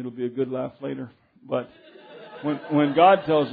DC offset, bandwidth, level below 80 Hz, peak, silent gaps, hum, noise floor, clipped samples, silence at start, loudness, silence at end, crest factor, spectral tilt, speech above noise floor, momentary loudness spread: under 0.1%; 4.9 kHz; -68 dBFS; -6 dBFS; none; none; -43 dBFS; under 0.1%; 0 s; -23 LUFS; 0 s; 18 dB; -10 dB/octave; 20 dB; 21 LU